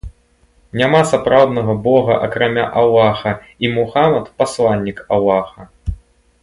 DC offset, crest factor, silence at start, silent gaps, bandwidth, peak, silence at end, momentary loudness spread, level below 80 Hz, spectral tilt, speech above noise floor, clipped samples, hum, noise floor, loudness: under 0.1%; 16 dB; 0.05 s; none; 11.5 kHz; 0 dBFS; 0.45 s; 15 LU; -38 dBFS; -6 dB/octave; 40 dB; under 0.1%; none; -54 dBFS; -15 LUFS